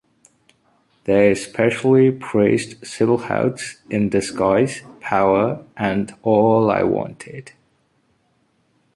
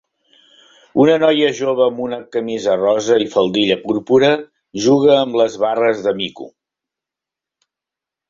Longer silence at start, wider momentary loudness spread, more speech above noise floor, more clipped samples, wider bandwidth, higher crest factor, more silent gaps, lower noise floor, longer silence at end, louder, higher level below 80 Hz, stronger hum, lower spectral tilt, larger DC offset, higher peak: about the same, 1.05 s vs 0.95 s; first, 16 LU vs 11 LU; second, 46 dB vs 71 dB; neither; first, 11.5 kHz vs 7.6 kHz; about the same, 18 dB vs 16 dB; neither; second, -64 dBFS vs -86 dBFS; second, 1.45 s vs 1.8 s; about the same, -18 LUFS vs -16 LUFS; first, -52 dBFS vs -58 dBFS; neither; first, -6.5 dB/octave vs -5 dB/octave; neither; about the same, -2 dBFS vs -2 dBFS